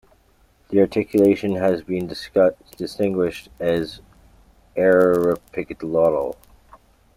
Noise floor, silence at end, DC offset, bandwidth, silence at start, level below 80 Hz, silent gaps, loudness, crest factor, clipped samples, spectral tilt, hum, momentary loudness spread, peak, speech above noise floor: -57 dBFS; 0.85 s; under 0.1%; 16 kHz; 0.7 s; -52 dBFS; none; -20 LUFS; 16 dB; under 0.1%; -7 dB/octave; none; 14 LU; -4 dBFS; 38 dB